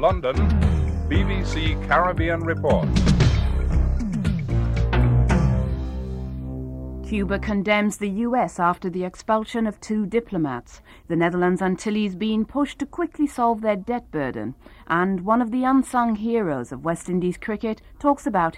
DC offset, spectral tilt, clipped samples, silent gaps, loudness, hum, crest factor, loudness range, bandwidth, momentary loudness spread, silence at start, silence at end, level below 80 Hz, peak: under 0.1%; -7 dB/octave; under 0.1%; none; -23 LUFS; none; 16 dB; 3 LU; 12 kHz; 9 LU; 0 s; 0 s; -28 dBFS; -6 dBFS